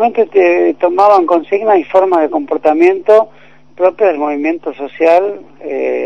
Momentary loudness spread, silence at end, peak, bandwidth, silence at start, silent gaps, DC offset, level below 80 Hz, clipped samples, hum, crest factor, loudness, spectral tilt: 11 LU; 0 s; 0 dBFS; 7.2 kHz; 0 s; none; 0.8%; -60 dBFS; 0.7%; none; 12 dB; -11 LUFS; -6 dB/octave